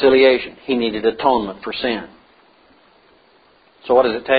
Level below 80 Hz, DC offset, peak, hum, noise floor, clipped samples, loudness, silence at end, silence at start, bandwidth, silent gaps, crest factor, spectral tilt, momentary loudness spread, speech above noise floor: -52 dBFS; under 0.1%; 0 dBFS; none; -53 dBFS; under 0.1%; -18 LUFS; 0 s; 0 s; 5 kHz; none; 18 dB; -9.5 dB/octave; 12 LU; 37 dB